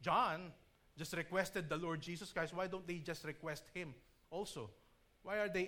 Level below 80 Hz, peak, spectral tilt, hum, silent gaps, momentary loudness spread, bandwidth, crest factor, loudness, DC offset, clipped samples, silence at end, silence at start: -70 dBFS; -22 dBFS; -4.5 dB/octave; none; none; 12 LU; 19.5 kHz; 20 dB; -43 LUFS; under 0.1%; under 0.1%; 0 s; 0 s